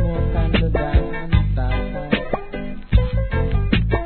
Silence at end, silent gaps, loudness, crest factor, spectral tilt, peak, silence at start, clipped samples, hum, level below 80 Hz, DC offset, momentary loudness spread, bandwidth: 0 s; none; -21 LUFS; 16 dB; -11 dB/octave; -2 dBFS; 0 s; under 0.1%; none; -22 dBFS; 0.3%; 6 LU; 4.4 kHz